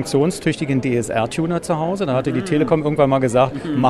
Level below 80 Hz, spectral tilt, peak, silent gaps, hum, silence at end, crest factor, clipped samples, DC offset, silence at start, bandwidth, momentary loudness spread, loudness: -48 dBFS; -6.5 dB/octave; -2 dBFS; none; none; 0 s; 16 dB; under 0.1%; under 0.1%; 0 s; 13 kHz; 5 LU; -19 LUFS